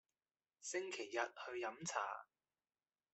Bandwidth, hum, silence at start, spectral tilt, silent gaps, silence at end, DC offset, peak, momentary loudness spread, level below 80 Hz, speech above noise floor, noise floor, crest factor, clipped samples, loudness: 8.2 kHz; none; 0.6 s; -2.5 dB/octave; none; 0.9 s; under 0.1%; -24 dBFS; 5 LU; under -90 dBFS; over 45 dB; under -90 dBFS; 24 dB; under 0.1%; -45 LUFS